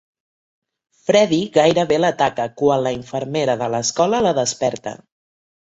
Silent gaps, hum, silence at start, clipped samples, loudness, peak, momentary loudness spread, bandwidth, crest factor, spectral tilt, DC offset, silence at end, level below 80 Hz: none; none; 1.1 s; under 0.1%; -18 LUFS; 0 dBFS; 9 LU; 8.2 kHz; 18 dB; -4 dB/octave; under 0.1%; 0.75 s; -56 dBFS